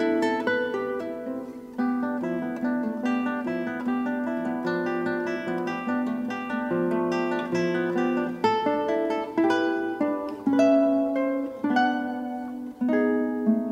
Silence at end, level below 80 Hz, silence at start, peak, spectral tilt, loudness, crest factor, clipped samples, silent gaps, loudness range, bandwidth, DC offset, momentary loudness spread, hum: 0 s; -66 dBFS; 0 s; -10 dBFS; -6.5 dB/octave; -26 LUFS; 16 dB; under 0.1%; none; 4 LU; 10 kHz; under 0.1%; 7 LU; none